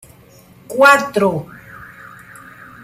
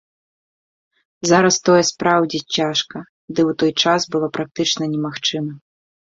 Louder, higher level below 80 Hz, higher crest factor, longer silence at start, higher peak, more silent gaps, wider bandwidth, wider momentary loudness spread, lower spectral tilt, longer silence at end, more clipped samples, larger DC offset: first, -14 LUFS vs -18 LUFS; first, -54 dBFS vs -60 dBFS; about the same, 18 dB vs 18 dB; second, 0.7 s vs 1.25 s; about the same, 0 dBFS vs 0 dBFS; second, none vs 3.09-3.28 s, 4.51-4.55 s; first, 15.5 kHz vs 7.8 kHz; first, 27 LU vs 12 LU; about the same, -4.5 dB/octave vs -3.5 dB/octave; first, 1.4 s vs 0.55 s; neither; neither